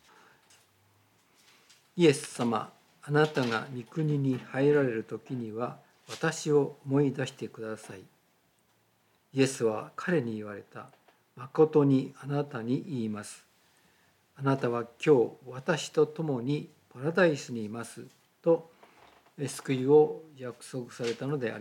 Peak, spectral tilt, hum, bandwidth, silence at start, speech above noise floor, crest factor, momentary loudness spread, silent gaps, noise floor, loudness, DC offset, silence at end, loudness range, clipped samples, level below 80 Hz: -10 dBFS; -6 dB/octave; none; 14 kHz; 1.95 s; 40 dB; 20 dB; 18 LU; none; -69 dBFS; -29 LUFS; under 0.1%; 0 s; 4 LU; under 0.1%; -82 dBFS